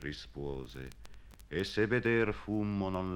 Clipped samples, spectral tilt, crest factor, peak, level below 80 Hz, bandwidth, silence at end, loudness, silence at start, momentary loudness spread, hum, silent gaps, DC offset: under 0.1%; -6.5 dB/octave; 18 dB; -16 dBFS; -52 dBFS; 17 kHz; 0 s; -34 LUFS; 0 s; 16 LU; none; none; under 0.1%